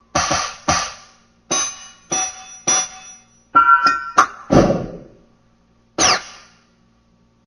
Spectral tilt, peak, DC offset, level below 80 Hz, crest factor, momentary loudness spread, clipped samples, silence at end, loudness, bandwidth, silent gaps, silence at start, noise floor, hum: -2.5 dB/octave; 0 dBFS; under 0.1%; -42 dBFS; 20 dB; 15 LU; under 0.1%; 1.1 s; -17 LUFS; 12 kHz; none; 0.15 s; -57 dBFS; none